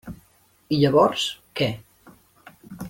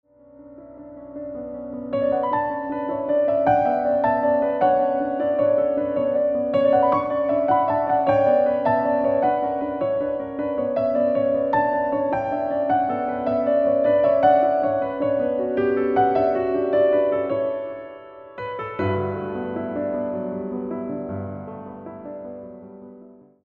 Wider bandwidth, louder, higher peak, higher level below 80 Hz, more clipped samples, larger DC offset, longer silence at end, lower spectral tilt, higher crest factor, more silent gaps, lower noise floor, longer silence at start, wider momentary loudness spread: first, 17 kHz vs 5 kHz; about the same, -22 LUFS vs -21 LUFS; about the same, -6 dBFS vs -6 dBFS; about the same, -56 dBFS vs -56 dBFS; neither; neither; second, 0 s vs 0.35 s; second, -5.5 dB/octave vs -9.5 dB/octave; about the same, 20 dB vs 16 dB; neither; first, -60 dBFS vs -47 dBFS; second, 0.05 s vs 0.4 s; first, 23 LU vs 16 LU